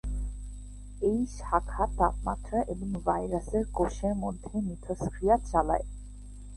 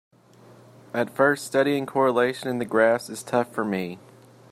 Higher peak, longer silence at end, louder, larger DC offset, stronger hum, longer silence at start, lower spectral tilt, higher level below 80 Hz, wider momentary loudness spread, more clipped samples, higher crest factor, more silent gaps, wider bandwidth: second, -10 dBFS vs -6 dBFS; second, 0 s vs 0.5 s; second, -30 LUFS vs -24 LUFS; neither; first, 50 Hz at -40 dBFS vs none; second, 0.05 s vs 0.95 s; first, -7.5 dB/octave vs -5 dB/octave; first, -38 dBFS vs -72 dBFS; first, 17 LU vs 9 LU; neither; about the same, 20 dB vs 20 dB; neither; second, 11.5 kHz vs 16 kHz